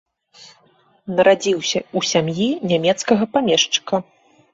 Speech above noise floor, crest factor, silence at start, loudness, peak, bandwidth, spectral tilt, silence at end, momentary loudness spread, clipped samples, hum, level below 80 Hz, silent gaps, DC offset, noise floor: 39 dB; 18 dB; 0.4 s; -18 LUFS; -2 dBFS; 8 kHz; -3.5 dB/octave; 0.5 s; 8 LU; under 0.1%; none; -60 dBFS; none; under 0.1%; -57 dBFS